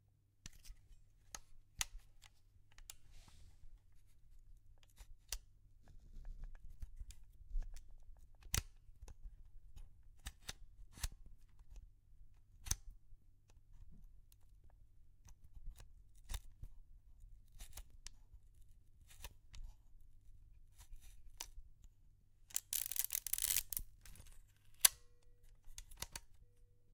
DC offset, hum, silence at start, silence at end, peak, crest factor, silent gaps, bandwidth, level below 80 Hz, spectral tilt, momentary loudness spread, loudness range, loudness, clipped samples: under 0.1%; none; 0.35 s; 0 s; -6 dBFS; 44 dB; none; 17.5 kHz; -56 dBFS; 0 dB/octave; 27 LU; 22 LU; -41 LUFS; under 0.1%